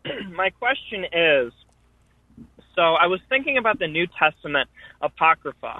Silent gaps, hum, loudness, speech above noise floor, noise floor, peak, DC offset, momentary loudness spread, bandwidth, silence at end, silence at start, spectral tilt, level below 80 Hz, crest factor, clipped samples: none; none; -21 LUFS; 38 dB; -60 dBFS; -4 dBFS; under 0.1%; 12 LU; 4.1 kHz; 0 s; 0.05 s; -6.5 dB/octave; -58 dBFS; 20 dB; under 0.1%